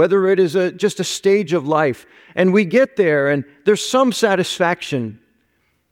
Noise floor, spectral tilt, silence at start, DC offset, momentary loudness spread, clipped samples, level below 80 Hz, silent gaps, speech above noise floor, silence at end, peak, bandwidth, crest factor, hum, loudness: -64 dBFS; -5 dB/octave; 0 s; under 0.1%; 7 LU; under 0.1%; -66 dBFS; none; 48 dB; 0.8 s; -2 dBFS; 16 kHz; 14 dB; none; -17 LUFS